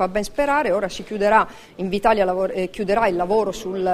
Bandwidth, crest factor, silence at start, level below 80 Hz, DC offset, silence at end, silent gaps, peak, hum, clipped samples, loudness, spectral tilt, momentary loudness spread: 15 kHz; 20 dB; 0 s; -44 dBFS; under 0.1%; 0 s; none; -2 dBFS; none; under 0.1%; -21 LUFS; -5 dB/octave; 8 LU